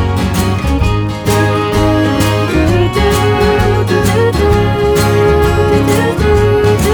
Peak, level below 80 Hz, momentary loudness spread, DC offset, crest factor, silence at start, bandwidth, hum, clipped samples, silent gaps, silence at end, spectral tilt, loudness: 0 dBFS; -20 dBFS; 3 LU; under 0.1%; 10 dB; 0 s; over 20 kHz; none; under 0.1%; none; 0 s; -6 dB/octave; -11 LUFS